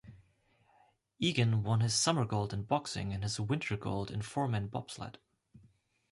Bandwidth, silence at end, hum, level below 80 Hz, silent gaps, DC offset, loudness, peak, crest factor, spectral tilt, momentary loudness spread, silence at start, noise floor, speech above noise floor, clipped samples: 11.5 kHz; 0.55 s; none; -58 dBFS; none; under 0.1%; -33 LUFS; -14 dBFS; 22 dB; -4.5 dB/octave; 11 LU; 0.05 s; -70 dBFS; 37 dB; under 0.1%